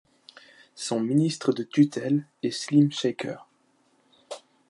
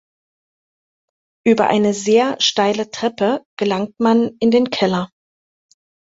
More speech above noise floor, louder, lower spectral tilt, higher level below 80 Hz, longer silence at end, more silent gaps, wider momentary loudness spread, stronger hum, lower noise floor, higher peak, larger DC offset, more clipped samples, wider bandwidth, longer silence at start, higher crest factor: second, 41 dB vs over 74 dB; second, -25 LUFS vs -17 LUFS; first, -6 dB/octave vs -4.5 dB/octave; second, -76 dBFS vs -60 dBFS; second, 0.35 s vs 1.05 s; second, none vs 3.46-3.57 s; first, 20 LU vs 7 LU; neither; second, -66 dBFS vs under -90 dBFS; second, -8 dBFS vs -2 dBFS; neither; neither; first, 11.5 kHz vs 8 kHz; second, 0.75 s vs 1.45 s; about the same, 18 dB vs 16 dB